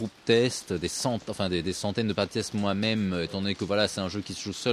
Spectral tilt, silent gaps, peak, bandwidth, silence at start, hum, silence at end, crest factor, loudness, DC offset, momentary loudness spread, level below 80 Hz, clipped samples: -4.5 dB/octave; none; -8 dBFS; 15 kHz; 0 s; none; 0 s; 20 dB; -28 LUFS; under 0.1%; 7 LU; -56 dBFS; under 0.1%